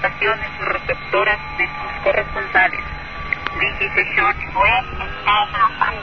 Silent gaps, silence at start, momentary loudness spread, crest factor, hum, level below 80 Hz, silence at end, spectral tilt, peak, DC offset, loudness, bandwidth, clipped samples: none; 0 s; 8 LU; 18 dB; none; -36 dBFS; 0 s; -5.5 dB/octave; -2 dBFS; 1%; -18 LUFS; 6.4 kHz; under 0.1%